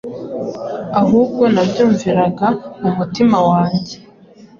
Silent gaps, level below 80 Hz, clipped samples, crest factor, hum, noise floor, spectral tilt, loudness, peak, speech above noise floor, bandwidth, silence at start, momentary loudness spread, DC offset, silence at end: none; -50 dBFS; under 0.1%; 14 dB; none; -43 dBFS; -7.5 dB/octave; -15 LUFS; -2 dBFS; 28 dB; 7.4 kHz; 0.05 s; 12 LU; under 0.1%; 0.15 s